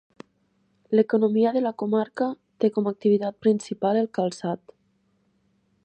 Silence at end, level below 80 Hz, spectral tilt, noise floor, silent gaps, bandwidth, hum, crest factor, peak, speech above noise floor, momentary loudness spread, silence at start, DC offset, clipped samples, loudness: 1.3 s; -76 dBFS; -7 dB/octave; -68 dBFS; none; 9 kHz; none; 18 dB; -6 dBFS; 45 dB; 8 LU; 0.9 s; under 0.1%; under 0.1%; -24 LUFS